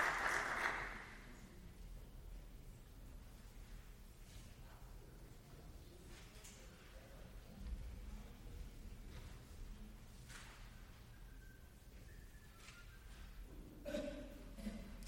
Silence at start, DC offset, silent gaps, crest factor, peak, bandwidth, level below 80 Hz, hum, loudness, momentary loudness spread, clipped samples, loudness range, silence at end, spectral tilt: 0 s; under 0.1%; none; 26 dB; -26 dBFS; 16.5 kHz; -56 dBFS; none; -51 LUFS; 14 LU; under 0.1%; 10 LU; 0 s; -4 dB/octave